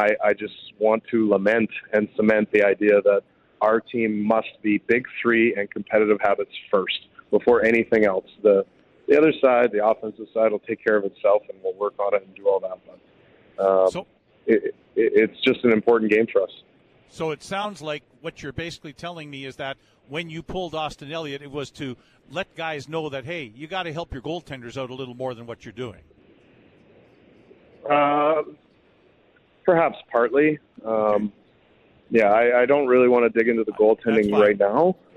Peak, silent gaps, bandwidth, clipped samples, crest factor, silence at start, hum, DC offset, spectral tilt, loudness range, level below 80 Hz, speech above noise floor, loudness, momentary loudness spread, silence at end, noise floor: -6 dBFS; none; 9.8 kHz; under 0.1%; 16 dB; 0 s; none; under 0.1%; -6.5 dB/octave; 12 LU; -58 dBFS; 37 dB; -22 LUFS; 16 LU; 0.25 s; -59 dBFS